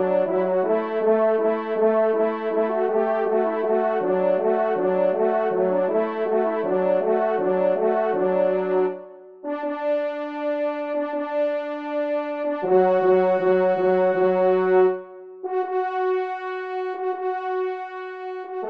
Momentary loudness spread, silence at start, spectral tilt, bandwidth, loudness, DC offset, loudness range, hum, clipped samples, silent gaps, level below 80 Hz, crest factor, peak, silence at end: 9 LU; 0 s; -9 dB/octave; 5 kHz; -22 LUFS; 0.2%; 6 LU; none; under 0.1%; none; -76 dBFS; 14 dB; -6 dBFS; 0 s